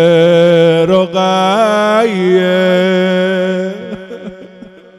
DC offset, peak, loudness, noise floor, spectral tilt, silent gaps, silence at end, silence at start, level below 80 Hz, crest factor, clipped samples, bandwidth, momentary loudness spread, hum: under 0.1%; 0 dBFS; -11 LUFS; -36 dBFS; -6 dB/octave; none; 0.3 s; 0 s; -54 dBFS; 12 dB; 0.4%; 12.5 kHz; 18 LU; none